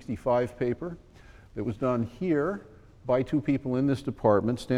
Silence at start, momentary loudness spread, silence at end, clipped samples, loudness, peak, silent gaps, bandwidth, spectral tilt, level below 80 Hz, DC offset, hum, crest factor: 0 s; 15 LU; 0 s; under 0.1%; -28 LUFS; -10 dBFS; none; 12 kHz; -8 dB/octave; -52 dBFS; under 0.1%; none; 18 dB